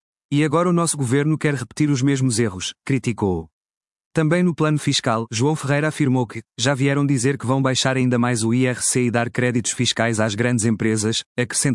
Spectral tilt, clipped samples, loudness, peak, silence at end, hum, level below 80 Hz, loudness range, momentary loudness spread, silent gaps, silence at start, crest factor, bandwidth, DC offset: -5 dB/octave; under 0.1%; -20 LUFS; -4 dBFS; 0 s; none; -58 dBFS; 2 LU; 5 LU; 3.53-3.61 s, 3.77-3.81 s, 3.92-4.11 s, 11.26-11.36 s; 0.3 s; 16 dB; 12 kHz; under 0.1%